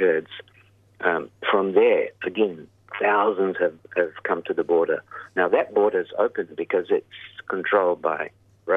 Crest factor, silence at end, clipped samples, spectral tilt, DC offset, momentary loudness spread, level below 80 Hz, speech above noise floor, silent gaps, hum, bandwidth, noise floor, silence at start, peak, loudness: 20 dB; 0 s; under 0.1%; -7.5 dB/octave; under 0.1%; 11 LU; -72 dBFS; 33 dB; none; none; 3.9 kHz; -56 dBFS; 0 s; -4 dBFS; -23 LUFS